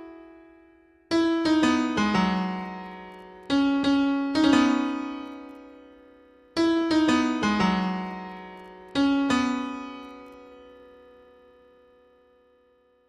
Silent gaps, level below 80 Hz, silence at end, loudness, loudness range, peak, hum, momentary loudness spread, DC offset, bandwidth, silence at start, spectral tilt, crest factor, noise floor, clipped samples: none; -56 dBFS; 2.4 s; -24 LUFS; 5 LU; -8 dBFS; none; 21 LU; under 0.1%; 11 kHz; 0 s; -5.5 dB/octave; 18 dB; -63 dBFS; under 0.1%